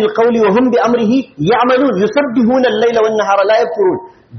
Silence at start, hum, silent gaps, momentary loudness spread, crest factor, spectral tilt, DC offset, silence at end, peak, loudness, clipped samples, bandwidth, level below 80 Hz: 0 s; none; none; 4 LU; 10 dB; -4.5 dB/octave; under 0.1%; 0 s; -2 dBFS; -12 LUFS; under 0.1%; 6.4 kHz; -52 dBFS